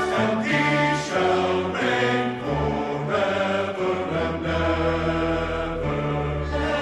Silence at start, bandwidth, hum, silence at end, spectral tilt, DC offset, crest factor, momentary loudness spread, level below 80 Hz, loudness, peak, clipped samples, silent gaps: 0 s; 12 kHz; none; 0 s; -6 dB/octave; under 0.1%; 14 dB; 5 LU; -40 dBFS; -23 LUFS; -8 dBFS; under 0.1%; none